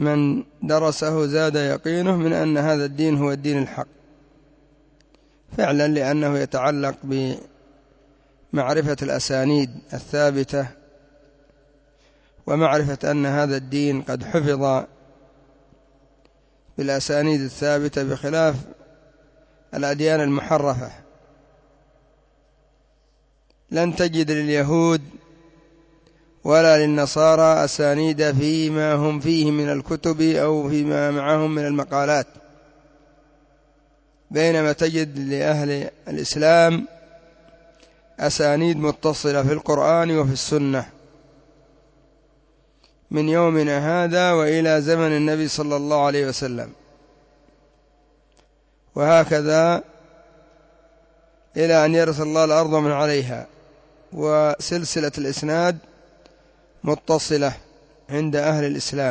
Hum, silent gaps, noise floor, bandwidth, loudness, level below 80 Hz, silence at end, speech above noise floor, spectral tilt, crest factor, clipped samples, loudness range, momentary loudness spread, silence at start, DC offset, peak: none; none; -60 dBFS; 8 kHz; -20 LUFS; -54 dBFS; 0 s; 40 dB; -5.5 dB/octave; 16 dB; under 0.1%; 6 LU; 10 LU; 0 s; under 0.1%; -4 dBFS